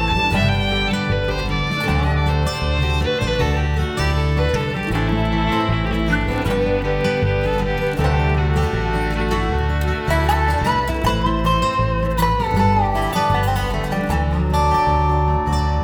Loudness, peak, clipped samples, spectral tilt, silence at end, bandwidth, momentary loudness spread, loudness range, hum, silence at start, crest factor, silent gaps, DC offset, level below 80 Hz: -19 LUFS; -4 dBFS; under 0.1%; -6 dB/octave; 0 s; 19 kHz; 4 LU; 1 LU; none; 0 s; 14 dB; none; under 0.1%; -24 dBFS